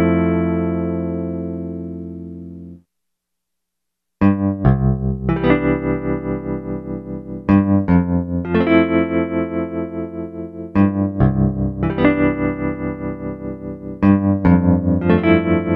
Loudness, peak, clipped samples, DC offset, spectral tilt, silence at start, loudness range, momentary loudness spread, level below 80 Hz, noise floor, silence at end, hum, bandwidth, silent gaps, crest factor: -18 LUFS; 0 dBFS; under 0.1%; under 0.1%; -11 dB/octave; 0 s; 7 LU; 14 LU; -34 dBFS; -80 dBFS; 0 s; none; 4.3 kHz; none; 18 dB